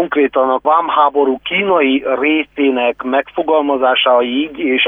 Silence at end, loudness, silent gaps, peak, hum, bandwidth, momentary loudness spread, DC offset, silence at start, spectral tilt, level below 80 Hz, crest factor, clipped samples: 0 s; -14 LUFS; none; -2 dBFS; none; 3.8 kHz; 5 LU; under 0.1%; 0 s; -7 dB/octave; -54 dBFS; 12 dB; under 0.1%